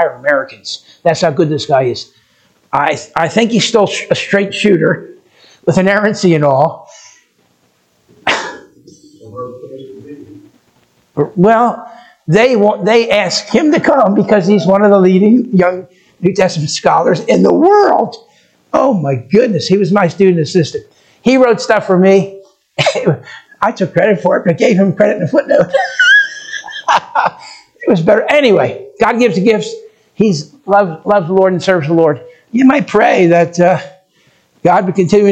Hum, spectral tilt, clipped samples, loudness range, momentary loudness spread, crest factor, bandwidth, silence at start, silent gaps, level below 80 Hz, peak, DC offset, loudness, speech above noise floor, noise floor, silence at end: none; -5.5 dB/octave; 0.1%; 6 LU; 12 LU; 12 dB; 9 kHz; 0 s; none; -54 dBFS; 0 dBFS; under 0.1%; -11 LUFS; 45 dB; -56 dBFS; 0 s